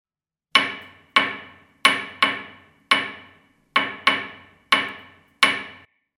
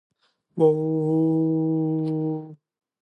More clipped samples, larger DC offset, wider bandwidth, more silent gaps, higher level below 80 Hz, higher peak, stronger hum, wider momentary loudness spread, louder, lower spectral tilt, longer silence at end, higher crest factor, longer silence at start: neither; neither; first, 17.5 kHz vs 4.5 kHz; neither; first, -68 dBFS vs -74 dBFS; first, 0 dBFS vs -8 dBFS; neither; first, 18 LU vs 12 LU; about the same, -21 LUFS vs -23 LUFS; second, -1 dB/octave vs -12 dB/octave; about the same, 0.45 s vs 0.45 s; first, 24 dB vs 16 dB; about the same, 0.55 s vs 0.55 s